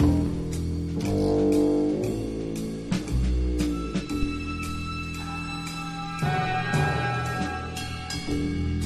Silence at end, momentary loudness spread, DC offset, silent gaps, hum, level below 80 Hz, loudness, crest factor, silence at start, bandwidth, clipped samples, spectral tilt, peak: 0 s; 9 LU; under 0.1%; none; none; -34 dBFS; -27 LUFS; 16 dB; 0 s; 13 kHz; under 0.1%; -6 dB/octave; -10 dBFS